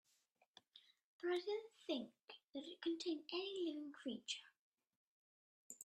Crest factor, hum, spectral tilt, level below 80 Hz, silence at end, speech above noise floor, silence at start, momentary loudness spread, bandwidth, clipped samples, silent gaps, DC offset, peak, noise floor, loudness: 18 dB; none; -2.5 dB/octave; under -90 dBFS; 0 s; 34 dB; 0.75 s; 19 LU; 13 kHz; under 0.1%; 1.04-1.19 s, 2.44-2.53 s, 4.59-4.72 s, 4.97-5.70 s; under 0.1%; -32 dBFS; -81 dBFS; -47 LUFS